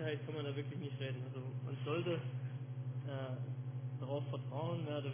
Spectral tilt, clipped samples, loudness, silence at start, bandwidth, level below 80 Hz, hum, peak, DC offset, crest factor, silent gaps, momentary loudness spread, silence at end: -6.5 dB/octave; under 0.1%; -43 LUFS; 0 s; 3.6 kHz; -82 dBFS; none; -28 dBFS; under 0.1%; 14 dB; none; 5 LU; 0 s